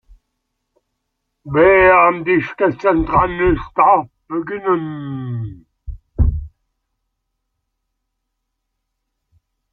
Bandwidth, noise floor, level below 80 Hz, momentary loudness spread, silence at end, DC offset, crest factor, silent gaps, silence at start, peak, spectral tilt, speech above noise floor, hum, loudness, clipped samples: 6 kHz; -75 dBFS; -32 dBFS; 17 LU; 3.25 s; under 0.1%; 18 dB; none; 1.45 s; 0 dBFS; -9.5 dB/octave; 59 dB; none; -16 LUFS; under 0.1%